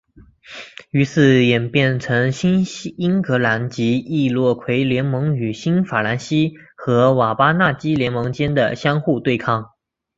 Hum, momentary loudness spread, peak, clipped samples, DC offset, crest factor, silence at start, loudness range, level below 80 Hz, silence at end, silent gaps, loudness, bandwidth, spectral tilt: none; 8 LU; -2 dBFS; under 0.1%; under 0.1%; 16 dB; 0.5 s; 2 LU; -52 dBFS; 0.5 s; none; -18 LUFS; 7.8 kHz; -7 dB/octave